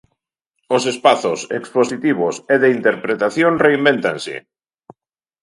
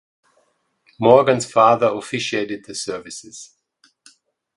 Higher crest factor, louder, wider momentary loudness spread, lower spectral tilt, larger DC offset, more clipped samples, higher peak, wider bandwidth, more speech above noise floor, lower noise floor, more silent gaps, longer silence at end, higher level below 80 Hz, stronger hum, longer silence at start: about the same, 18 dB vs 20 dB; about the same, -17 LUFS vs -18 LUFS; second, 8 LU vs 20 LU; about the same, -4.5 dB/octave vs -4.5 dB/octave; neither; neither; about the same, 0 dBFS vs 0 dBFS; about the same, 11.5 kHz vs 11.5 kHz; first, 60 dB vs 47 dB; first, -76 dBFS vs -64 dBFS; neither; about the same, 1.05 s vs 1.1 s; about the same, -62 dBFS vs -62 dBFS; neither; second, 0.7 s vs 1 s